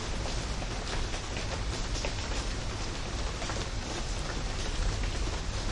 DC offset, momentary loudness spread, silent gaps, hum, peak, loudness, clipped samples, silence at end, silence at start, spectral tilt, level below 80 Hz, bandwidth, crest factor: under 0.1%; 2 LU; none; none; -20 dBFS; -35 LUFS; under 0.1%; 0 s; 0 s; -4 dB/octave; -36 dBFS; 11.5 kHz; 14 dB